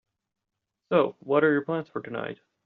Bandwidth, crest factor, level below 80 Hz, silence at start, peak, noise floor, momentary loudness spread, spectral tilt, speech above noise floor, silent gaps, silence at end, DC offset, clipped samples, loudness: 4.6 kHz; 20 dB; -72 dBFS; 0.9 s; -8 dBFS; -84 dBFS; 12 LU; -5 dB/octave; 59 dB; none; 0.3 s; under 0.1%; under 0.1%; -26 LUFS